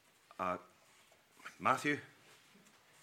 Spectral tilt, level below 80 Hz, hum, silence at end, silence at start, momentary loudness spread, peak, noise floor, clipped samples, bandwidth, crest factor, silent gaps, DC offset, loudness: -4.5 dB/octave; -84 dBFS; none; 0.95 s; 0.4 s; 22 LU; -16 dBFS; -67 dBFS; under 0.1%; 16.5 kHz; 26 dB; none; under 0.1%; -37 LUFS